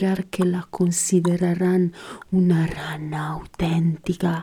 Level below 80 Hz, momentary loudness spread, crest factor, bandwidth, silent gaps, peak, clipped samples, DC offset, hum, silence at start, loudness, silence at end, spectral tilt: -48 dBFS; 9 LU; 14 dB; 14.5 kHz; none; -8 dBFS; under 0.1%; under 0.1%; none; 0 s; -22 LUFS; 0 s; -6 dB/octave